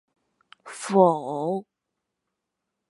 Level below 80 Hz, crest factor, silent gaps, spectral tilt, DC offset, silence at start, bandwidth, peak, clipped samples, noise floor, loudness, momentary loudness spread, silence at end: -82 dBFS; 24 dB; none; -6.5 dB/octave; under 0.1%; 0.65 s; 11.5 kHz; -4 dBFS; under 0.1%; -83 dBFS; -23 LUFS; 17 LU; 1.3 s